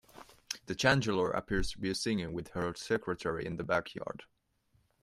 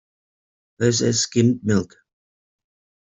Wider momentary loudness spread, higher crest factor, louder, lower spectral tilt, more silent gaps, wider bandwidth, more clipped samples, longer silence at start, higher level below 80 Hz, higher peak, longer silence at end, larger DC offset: first, 14 LU vs 5 LU; about the same, 22 dB vs 20 dB; second, -34 LUFS vs -20 LUFS; about the same, -4.5 dB/octave vs -4.5 dB/octave; neither; first, 15.5 kHz vs 8.2 kHz; neither; second, 0.15 s vs 0.8 s; first, -50 dBFS vs -56 dBFS; second, -12 dBFS vs -4 dBFS; second, 0.8 s vs 1.15 s; neither